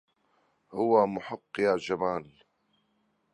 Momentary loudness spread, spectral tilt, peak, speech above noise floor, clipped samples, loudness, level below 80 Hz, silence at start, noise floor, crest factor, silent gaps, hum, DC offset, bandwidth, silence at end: 13 LU; -6.5 dB/octave; -10 dBFS; 45 dB; under 0.1%; -28 LUFS; -68 dBFS; 0.7 s; -73 dBFS; 20 dB; none; none; under 0.1%; 11 kHz; 1.1 s